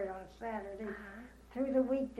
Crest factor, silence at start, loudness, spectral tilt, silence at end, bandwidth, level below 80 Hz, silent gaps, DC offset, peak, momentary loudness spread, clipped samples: 18 dB; 0 s; -38 LUFS; -7.5 dB/octave; 0 s; 11.5 kHz; -60 dBFS; none; under 0.1%; -20 dBFS; 16 LU; under 0.1%